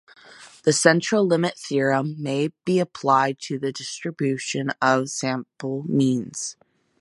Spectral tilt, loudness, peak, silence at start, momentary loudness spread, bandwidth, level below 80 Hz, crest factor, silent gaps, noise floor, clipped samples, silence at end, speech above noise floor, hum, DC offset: -4.5 dB/octave; -23 LUFS; -2 dBFS; 0.4 s; 12 LU; 11.5 kHz; -70 dBFS; 22 dB; none; -47 dBFS; under 0.1%; 0.5 s; 25 dB; none; under 0.1%